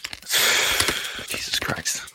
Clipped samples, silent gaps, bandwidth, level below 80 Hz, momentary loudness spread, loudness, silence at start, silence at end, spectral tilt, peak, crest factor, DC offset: under 0.1%; none; 17 kHz; -50 dBFS; 10 LU; -21 LUFS; 0 s; 0.05 s; -0.5 dB/octave; -2 dBFS; 24 dB; under 0.1%